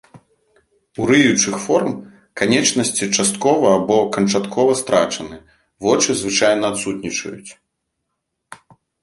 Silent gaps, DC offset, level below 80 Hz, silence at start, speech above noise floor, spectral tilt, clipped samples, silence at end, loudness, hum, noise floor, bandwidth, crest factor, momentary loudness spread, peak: none; under 0.1%; -56 dBFS; 0.15 s; 59 dB; -3.5 dB/octave; under 0.1%; 0.5 s; -17 LUFS; none; -76 dBFS; 11.5 kHz; 18 dB; 12 LU; 0 dBFS